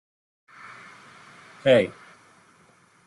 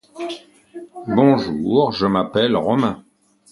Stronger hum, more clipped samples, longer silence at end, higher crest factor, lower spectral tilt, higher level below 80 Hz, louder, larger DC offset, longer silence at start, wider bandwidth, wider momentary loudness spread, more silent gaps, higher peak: neither; neither; first, 1.15 s vs 0.5 s; about the same, 22 dB vs 18 dB; second, -6 dB/octave vs -7.5 dB/octave; second, -68 dBFS vs -52 dBFS; second, -22 LUFS vs -18 LUFS; neither; first, 1.65 s vs 0.15 s; about the same, 11.5 kHz vs 11.5 kHz; first, 28 LU vs 20 LU; neither; second, -6 dBFS vs 0 dBFS